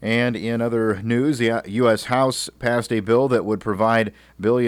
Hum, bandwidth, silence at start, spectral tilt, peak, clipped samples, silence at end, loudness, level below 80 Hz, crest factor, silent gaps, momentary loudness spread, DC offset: none; 16 kHz; 0 s; -5.5 dB/octave; -8 dBFS; under 0.1%; 0 s; -21 LUFS; -54 dBFS; 12 dB; none; 5 LU; under 0.1%